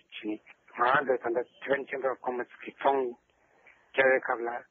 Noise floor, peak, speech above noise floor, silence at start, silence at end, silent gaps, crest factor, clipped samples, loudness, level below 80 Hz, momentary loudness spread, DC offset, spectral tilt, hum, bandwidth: -62 dBFS; -10 dBFS; 33 dB; 0.1 s; 0.1 s; none; 20 dB; under 0.1%; -29 LUFS; -80 dBFS; 13 LU; under 0.1%; -2 dB/octave; none; 4.4 kHz